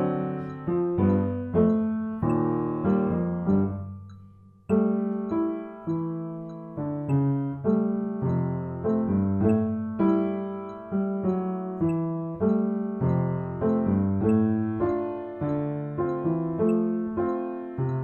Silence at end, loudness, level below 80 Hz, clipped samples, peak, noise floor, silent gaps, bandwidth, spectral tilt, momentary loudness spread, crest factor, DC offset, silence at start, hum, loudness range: 0 s; -27 LUFS; -54 dBFS; under 0.1%; -10 dBFS; -51 dBFS; none; 4.2 kHz; -11.5 dB/octave; 8 LU; 16 dB; under 0.1%; 0 s; none; 3 LU